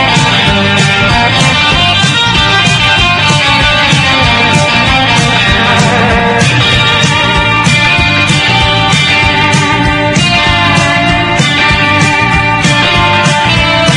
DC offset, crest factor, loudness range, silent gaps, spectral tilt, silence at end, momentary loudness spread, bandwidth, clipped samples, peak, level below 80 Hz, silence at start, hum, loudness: under 0.1%; 8 dB; 1 LU; none; -4 dB/octave; 0 s; 2 LU; 12 kHz; 0.8%; 0 dBFS; -24 dBFS; 0 s; none; -7 LUFS